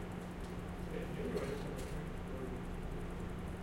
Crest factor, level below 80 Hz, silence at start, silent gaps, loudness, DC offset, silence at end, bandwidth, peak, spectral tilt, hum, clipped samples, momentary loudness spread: 14 dB; -48 dBFS; 0 s; none; -44 LUFS; under 0.1%; 0 s; 16.5 kHz; -28 dBFS; -6.5 dB/octave; none; under 0.1%; 5 LU